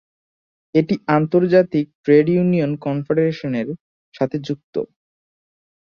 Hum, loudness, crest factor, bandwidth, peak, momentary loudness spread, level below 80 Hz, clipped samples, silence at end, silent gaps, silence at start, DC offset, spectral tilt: none; -19 LUFS; 18 dB; 6.8 kHz; -2 dBFS; 12 LU; -60 dBFS; under 0.1%; 1 s; 1.95-2.04 s, 3.80-4.12 s, 4.63-4.73 s; 0.75 s; under 0.1%; -9 dB/octave